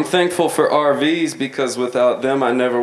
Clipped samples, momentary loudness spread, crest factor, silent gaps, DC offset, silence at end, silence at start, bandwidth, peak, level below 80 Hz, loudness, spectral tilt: under 0.1%; 5 LU; 14 dB; none; under 0.1%; 0 s; 0 s; 13.5 kHz; -2 dBFS; -66 dBFS; -17 LUFS; -4.5 dB/octave